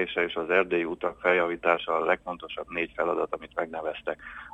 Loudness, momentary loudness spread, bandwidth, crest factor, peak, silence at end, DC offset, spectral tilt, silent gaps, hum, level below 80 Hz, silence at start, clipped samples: -28 LUFS; 10 LU; 8.4 kHz; 22 dB; -6 dBFS; 0 s; under 0.1%; -6 dB/octave; none; none; -60 dBFS; 0 s; under 0.1%